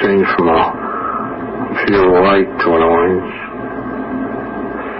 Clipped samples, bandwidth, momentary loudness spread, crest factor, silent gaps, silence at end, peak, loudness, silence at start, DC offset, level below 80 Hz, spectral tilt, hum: under 0.1%; 5.8 kHz; 12 LU; 12 dB; none; 0 s; -2 dBFS; -15 LUFS; 0 s; under 0.1%; -40 dBFS; -11.5 dB/octave; none